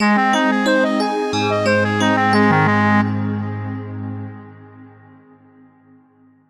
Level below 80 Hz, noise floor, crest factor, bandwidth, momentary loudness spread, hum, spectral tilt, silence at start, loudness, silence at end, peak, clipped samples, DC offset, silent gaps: -58 dBFS; -53 dBFS; 14 dB; 11.5 kHz; 14 LU; none; -6 dB/octave; 0 s; -17 LUFS; 1.6 s; -4 dBFS; under 0.1%; under 0.1%; none